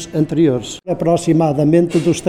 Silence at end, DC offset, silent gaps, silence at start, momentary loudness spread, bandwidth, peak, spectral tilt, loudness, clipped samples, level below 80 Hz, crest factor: 0 s; under 0.1%; none; 0 s; 7 LU; 12 kHz; -2 dBFS; -7 dB/octave; -15 LUFS; under 0.1%; -46 dBFS; 12 dB